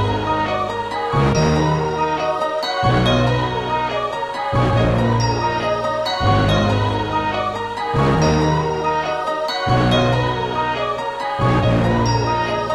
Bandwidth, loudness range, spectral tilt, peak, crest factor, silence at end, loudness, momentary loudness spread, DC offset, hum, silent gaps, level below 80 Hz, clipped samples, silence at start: 12 kHz; 1 LU; -6.5 dB/octave; -2 dBFS; 16 dB; 0 s; -18 LUFS; 6 LU; under 0.1%; none; none; -34 dBFS; under 0.1%; 0 s